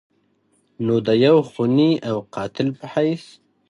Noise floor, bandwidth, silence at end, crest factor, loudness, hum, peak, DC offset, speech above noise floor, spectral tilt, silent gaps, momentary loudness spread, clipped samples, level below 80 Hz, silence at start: -64 dBFS; 11 kHz; 0.5 s; 16 dB; -20 LUFS; none; -4 dBFS; under 0.1%; 45 dB; -7.5 dB/octave; none; 11 LU; under 0.1%; -62 dBFS; 0.8 s